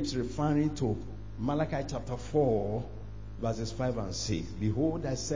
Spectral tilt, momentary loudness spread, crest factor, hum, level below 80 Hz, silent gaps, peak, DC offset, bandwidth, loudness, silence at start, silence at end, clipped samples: -6 dB/octave; 9 LU; 16 dB; none; -46 dBFS; none; -16 dBFS; 0.5%; 7.6 kHz; -32 LUFS; 0 s; 0 s; under 0.1%